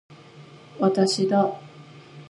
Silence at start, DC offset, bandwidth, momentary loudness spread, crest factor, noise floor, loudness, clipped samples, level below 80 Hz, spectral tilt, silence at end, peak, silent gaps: 0.1 s; under 0.1%; 11.5 kHz; 6 LU; 18 dB; -47 dBFS; -22 LUFS; under 0.1%; -74 dBFS; -5.5 dB/octave; 0.05 s; -8 dBFS; none